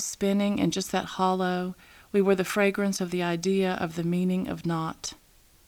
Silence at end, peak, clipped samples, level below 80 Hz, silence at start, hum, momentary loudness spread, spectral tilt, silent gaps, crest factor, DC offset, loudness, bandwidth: 0.55 s; -10 dBFS; under 0.1%; -58 dBFS; 0 s; none; 8 LU; -5 dB/octave; none; 18 dB; under 0.1%; -27 LUFS; 18.5 kHz